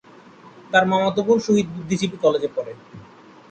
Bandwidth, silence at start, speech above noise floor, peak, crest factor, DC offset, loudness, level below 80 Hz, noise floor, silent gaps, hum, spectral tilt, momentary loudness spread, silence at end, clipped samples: 9 kHz; 0.45 s; 26 dB; -4 dBFS; 18 dB; under 0.1%; -20 LUFS; -60 dBFS; -46 dBFS; none; none; -5.5 dB/octave; 12 LU; 0.45 s; under 0.1%